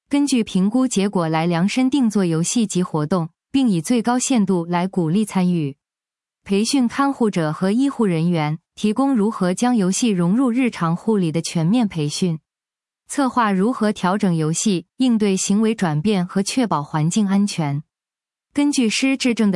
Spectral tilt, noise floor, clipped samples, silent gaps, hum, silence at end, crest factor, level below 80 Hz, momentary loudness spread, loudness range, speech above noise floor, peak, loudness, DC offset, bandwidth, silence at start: -5.5 dB/octave; under -90 dBFS; under 0.1%; none; none; 0 s; 14 dB; -62 dBFS; 4 LU; 2 LU; over 72 dB; -4 dBFS; -19 LUFS; under 0.1%; 12 kHz; 0.1 s